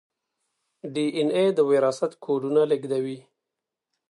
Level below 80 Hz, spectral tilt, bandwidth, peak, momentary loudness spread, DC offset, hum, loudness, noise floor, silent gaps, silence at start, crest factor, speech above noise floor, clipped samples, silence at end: -78 dBFS; -6 dB/octave; 11.5 kHz; -10 dBFS; 13 LU; under 0.1%; none; -24 LUFS; -86 dBFS; none; 0.85 s; 16 dB; 63 dB; under 0.1%; 0.9 s